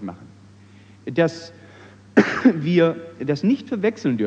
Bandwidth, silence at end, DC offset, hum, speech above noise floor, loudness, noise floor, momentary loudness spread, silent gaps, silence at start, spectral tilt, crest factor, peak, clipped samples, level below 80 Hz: 8.2 kHz; 0 s; under 0.1%; none; 27 dB; -20 LUFS; -47 dBFS; 18 LU; none; 0 s; -7 dB/octave; 20 dB; 0 dBFS; under 0.1%; -64 dBFS